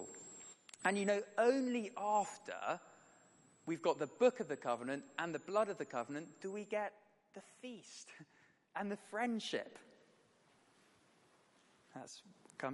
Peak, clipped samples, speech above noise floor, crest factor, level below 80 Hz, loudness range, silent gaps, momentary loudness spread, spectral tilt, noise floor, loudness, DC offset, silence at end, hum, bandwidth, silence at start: -20 dBFS; under 0.1%; 32 dB; 22 dB; under -90 dBFS; 8 LU; none; 20 LU; -4.5 dB/octave; -71 dBFS; -39 LUFS; under 0.1%; 0 s; none; 11.5 kHz; 0 s